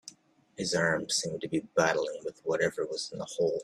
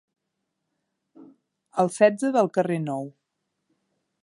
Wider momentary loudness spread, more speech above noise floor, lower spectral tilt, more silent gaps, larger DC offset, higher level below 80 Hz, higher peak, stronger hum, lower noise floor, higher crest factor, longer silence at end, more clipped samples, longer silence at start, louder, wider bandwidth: second, 9 LU vs 13 LU; second, 23 dB vs 58 dB; second, -3.5 dB/octave vs -6.5 dB/octave; neither; neither; first, -68 dBFS vs -80 dBFS; second, -12 dBFS vs -4 dBFS; neither; second, -54 dBFS vs -80 dBFS; about the same, 20 dB vs 22 dB; second, 0 s vs 1.15 s; neither; second, 0.05 s vs 1.2 s; second, -31 LUFS vs -23 LUFS; first, 13 kHz vs 11.5 kHz